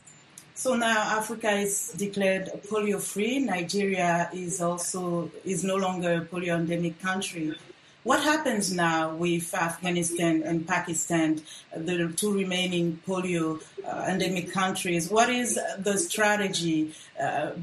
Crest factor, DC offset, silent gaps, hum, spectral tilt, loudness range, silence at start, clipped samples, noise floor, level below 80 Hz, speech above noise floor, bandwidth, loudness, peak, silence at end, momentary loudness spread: 18 dB; under 0.1%; none; none; -4 dB/octave; 3 LU; 0.35 s; under 0.1%; -51 dBFS; -66 dBFS; 24 dB; 12.5 kHz; -27 LUFS; -8 dBFS; 0 s; 8 LU